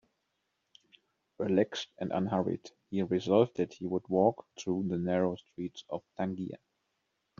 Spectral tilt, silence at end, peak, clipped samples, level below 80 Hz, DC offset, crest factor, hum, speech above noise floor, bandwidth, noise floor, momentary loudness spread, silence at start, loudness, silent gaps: -6 dB/octave; 0.85 s; -12 dBFS; under 0.1%; -72 dBFS; under 0.1%; 22 dB; none; 49 dB; 7.4 kHz; -81 dBFS; 14 LU; 1.4 s; -33 LUFS; none